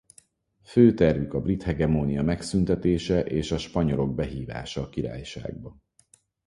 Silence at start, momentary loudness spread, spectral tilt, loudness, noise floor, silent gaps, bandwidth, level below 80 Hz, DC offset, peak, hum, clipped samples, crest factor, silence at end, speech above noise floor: 0.7 s; 16 LU; -7 dB/octave; -25 LUFS; -62 dBFS; none; 11.5 kHz; -42 dBFS; under 0.1%; -6 dBFS; none; under 0.1%; 20 dB; 0.75 s; 38 dB